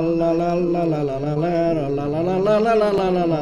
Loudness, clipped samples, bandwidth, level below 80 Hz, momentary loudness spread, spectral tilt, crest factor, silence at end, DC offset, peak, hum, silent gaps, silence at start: -20 LUFS; under 0.1%; 10.5 kHz; -44 dBFS; 5 LU; -8 dB/octave; 14 dB; 0 s; under 0.1%; -6 dBFS; none; none; 0 s